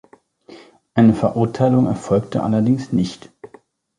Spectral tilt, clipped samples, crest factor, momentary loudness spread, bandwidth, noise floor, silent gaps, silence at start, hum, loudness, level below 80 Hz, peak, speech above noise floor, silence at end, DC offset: -8 dB/octave; under 0.1%; 18 dB; 8 LU; 10.5 kHz; -50 dBFS; none; 0.5 s; none; -18 LUFS; -50 dBFS; -2 dBFS; 33 dB; 0.5 s; under 0.1%